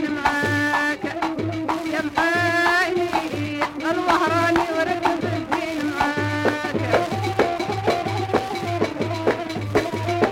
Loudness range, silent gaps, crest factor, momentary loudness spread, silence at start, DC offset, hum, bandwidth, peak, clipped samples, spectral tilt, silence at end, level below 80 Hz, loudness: 2 LU; none; 16 dB; 6 LU; 0 s; under 0.1%; none; 16.5 kHz; -6 dBFS; under 0.1%; -5.5 dB/octave; 0 s; -50 dBFS; -22 LUFS